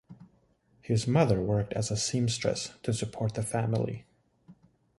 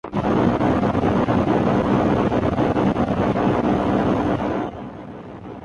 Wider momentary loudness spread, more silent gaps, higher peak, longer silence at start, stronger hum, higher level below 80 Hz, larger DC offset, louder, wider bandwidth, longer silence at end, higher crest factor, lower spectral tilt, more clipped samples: second, 8 LU vs 15 LU; neither; second, -10 dBFS vs -6 dBFS; about the same, 0.1 s vs 0.05 s; neither; second, -54 dBFS vs -38 dBFS; neither; second, -30 LUFS vs -20 LUFS; first, 11.5 kHz vs 10 kHz; first, 0.5 s vs 0 s; first, 20 dB vs 14 dB; second, -5.5 dB/octave vs -8.5 dB/octave; neither